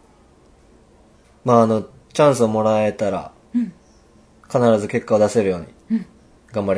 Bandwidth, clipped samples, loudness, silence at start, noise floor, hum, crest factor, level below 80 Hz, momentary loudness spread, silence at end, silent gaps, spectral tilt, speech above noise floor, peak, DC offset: 11 kHz; under 0.1%; -19 LUFS; 1.45 s; -52 dBFS; none; 20 dB; -56 dBFS; 12 LU; 0 s; none; -6.5 dB/octave; 34 dB; 0 dBFS; under 0.1%